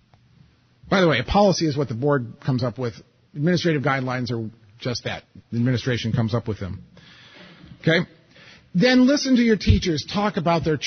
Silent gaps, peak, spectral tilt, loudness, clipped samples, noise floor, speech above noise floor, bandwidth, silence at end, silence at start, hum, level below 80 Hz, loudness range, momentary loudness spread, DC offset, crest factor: none; -4 dBFS; -6 dB/octave; -22 LUFS; under 0.1%; -56 dBFS; 35 dB; 6.6 kHz; 0 s; 0.85 s; none; -38 dBFS; 6 LU; 13 LU; under 0.1%; 18 dB